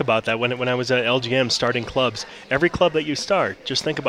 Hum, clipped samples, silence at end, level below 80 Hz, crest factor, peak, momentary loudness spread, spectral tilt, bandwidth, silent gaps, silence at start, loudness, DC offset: none; under 0.1%; 0 s; -50 dBFS; 18 dB; -4 dBFS; 5 LU; -4 dB/octave; 13 kHz; none; 0 s; -21 LUFS; under 0.1%